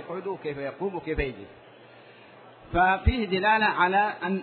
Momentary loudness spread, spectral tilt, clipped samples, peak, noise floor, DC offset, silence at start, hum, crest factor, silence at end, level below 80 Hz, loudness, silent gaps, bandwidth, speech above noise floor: 12 LU; -9 dB/octave; under 0.1%; -8 dBFS; -50 dBFS; under 0.1%; 0 s; none; 18 dB; 0 s; -40 dBFS; -25 LUFS; none; 4.5 kHz; 25 dB